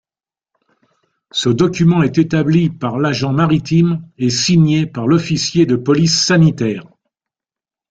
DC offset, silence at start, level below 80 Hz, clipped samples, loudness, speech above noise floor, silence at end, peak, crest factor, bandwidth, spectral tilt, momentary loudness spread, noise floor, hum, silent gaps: under 0.1%; 1.35 s; -48 dBFS; under 0.1%; -14 LUFS; over 76 dB; 1.1 s; -2 dBFS; 14 dB; 7.8 kHz; -5.5 dB/octave; 7 LU; under -90 dBFS; none; none